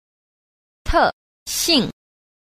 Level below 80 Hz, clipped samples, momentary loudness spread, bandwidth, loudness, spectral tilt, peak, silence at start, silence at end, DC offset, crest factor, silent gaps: -36 dBFS; under 0.1%; 16 LU; 15.5 kHz; -19 LUFS; -2.5 dB/octave; -4 dBFS; 0.85 s; 0.65 s; under 0.1%; 20 dB; 1.13-1.46 s